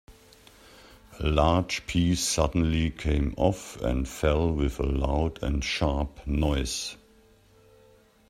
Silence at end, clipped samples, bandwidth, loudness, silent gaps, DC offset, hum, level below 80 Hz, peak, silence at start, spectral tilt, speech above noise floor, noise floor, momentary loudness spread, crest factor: 1.35 s; under 0.1%; 14 kHz; -27 LUFS; none; under 0.1%; none; -34 dBFS; -6 dBFS; 0.1 s; -5 dB/octave; 32 dB; -58 dBFS; 6 LU; 20 dB